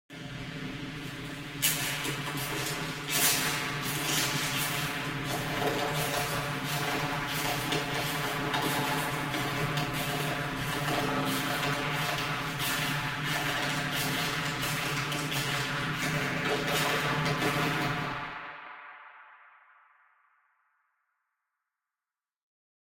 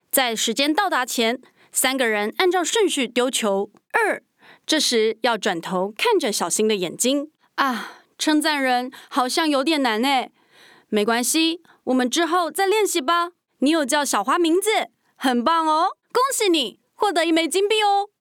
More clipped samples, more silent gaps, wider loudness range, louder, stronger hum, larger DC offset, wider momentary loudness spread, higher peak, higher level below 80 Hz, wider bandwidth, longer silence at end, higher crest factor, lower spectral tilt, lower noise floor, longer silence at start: neither; neither; about the same, 3 LU vs 1 LU; second, -30 LUFS vs -21 LUFS; neither; neither; first, 11 LU vs 7 LU; second, -10 dBFS vs -4 dBFS; first, -54 dBFS vs -72 dBFS; second, 16.5 kHz vs 19 kHz; first, 3.45 s vs 0.15 s; about the same, 22 dB vs 18 dB; about the same, -3 dB/octave vs -2 dB/octave; first, under -90 dBFS vs -52 dBFS; about the same, 0.1 s vs 0.15 s